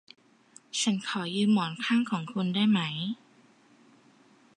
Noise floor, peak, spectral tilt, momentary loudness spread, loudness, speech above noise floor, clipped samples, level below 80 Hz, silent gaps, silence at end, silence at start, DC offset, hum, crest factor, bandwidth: -60 dBFS; -14 dBFS; -4.5 dB/octave; 9 LU; -28 LUFS; 33 dB; under 0.1%; -78 dBFS; none; 1.4 s; 0.75 s; under 0.1%; none; 16 dB; 11.5 kHz